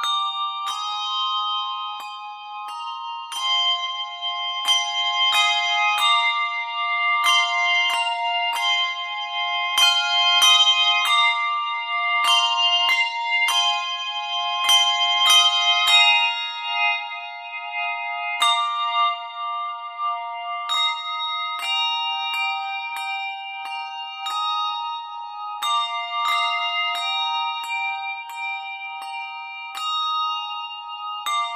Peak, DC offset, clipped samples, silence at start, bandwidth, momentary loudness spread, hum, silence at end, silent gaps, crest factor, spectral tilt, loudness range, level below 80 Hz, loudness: -4 dBFS; under 0.1%; under 0.1%; 0 s; 15.5 kHz; 15 LU; none; 0 s; none; 18 dB; 5.5 dB/octave; 10 LU; -88 dBFS; -20 LUFS